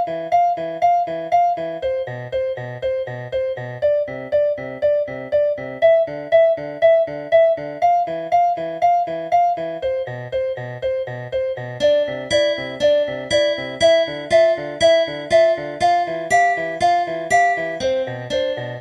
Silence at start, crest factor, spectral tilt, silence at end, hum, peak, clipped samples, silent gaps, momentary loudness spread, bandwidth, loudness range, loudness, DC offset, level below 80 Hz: 0 s; 16 dB; -4 dB/octave; 0 s; none; -4 dBFS; under 0.1%; none; 9 LU; 10.5 kHz; 5 LU; -19 LUFS; under 0.1%; -54 dBFS